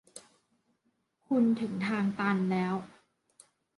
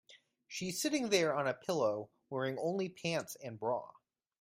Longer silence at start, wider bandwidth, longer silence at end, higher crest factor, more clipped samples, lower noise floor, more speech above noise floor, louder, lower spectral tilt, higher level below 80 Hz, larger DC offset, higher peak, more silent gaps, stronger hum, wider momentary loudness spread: about the same, 0.15 s vs 0.1 s; second, 11.5 kHz vs 16 kHz; first, 0.9 s vs 0.5 s; about the same, 18 dB vs 22 dB; neither; first, -76 dBFS vs -59 dBFS; first, 47 dB vs 23 dB; first, -30 LUFS vs -36 LUFS; first, -7 dB/octave vs -4 dB/octave; first, -74 dBFS vs -80 dBFS; neither; about the same, -14 dBFS vs -14 dBFS; neither; neither; about the same, 12 LU vs 12 LU